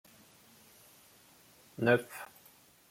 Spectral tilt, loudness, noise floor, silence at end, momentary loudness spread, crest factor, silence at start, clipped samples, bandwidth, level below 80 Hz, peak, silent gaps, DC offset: -6 dB/octave; -31 LUFS; -62 dBFS; 0.65 s; 28 LU; 26 dB; 1.8 s; under 0.1%; 16.5 kHz; -78 dBFS; -12 dBFS; none; under 0.1%